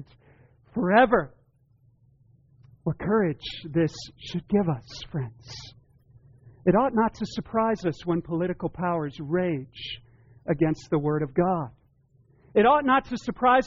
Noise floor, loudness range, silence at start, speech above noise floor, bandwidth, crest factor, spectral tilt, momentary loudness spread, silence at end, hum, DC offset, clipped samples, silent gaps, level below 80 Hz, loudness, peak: -62 dBFS; 4 LU; 0 s; 38 dB; 7.4 kHz; 18 dB; -5.5 dB/octave; 16 LU; 0 s; none; under 0.1%; under 0.1%; none; -54 dBFS; -26 LUFS; -8 dBFS